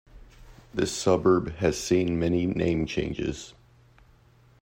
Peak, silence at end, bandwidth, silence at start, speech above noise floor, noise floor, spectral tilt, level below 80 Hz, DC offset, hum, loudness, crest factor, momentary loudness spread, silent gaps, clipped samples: -8 dBFS; 1.1 s; 16 kHz; 0.15 s; 32 dB; -58 dBFS; -5.5 dB/octave; -48 dBFS; under 0.1%; none; -26 LUFS; 18 dB; 11 LU; none; under 0.1%